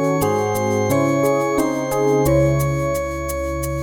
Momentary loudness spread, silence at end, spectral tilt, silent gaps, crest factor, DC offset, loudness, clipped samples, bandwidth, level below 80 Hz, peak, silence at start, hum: 7 LU; 0 s; -6.5 dB/octave; none; 12 dB; under 0.1%; -19 LUFS; under 0.1%; 19 kHz; -34 dBFS; -6 dBFS; 0 s; none